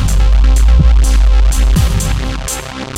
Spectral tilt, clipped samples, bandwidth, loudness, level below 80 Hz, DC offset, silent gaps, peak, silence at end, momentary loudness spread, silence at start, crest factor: -5 dB/octave; under 0.1%; 14.5 kHz; -12 LUFS; -10 dBFS; under 0.1%; none; 0 dBFS; 0 s; 9 LU; 0 s; 10 dB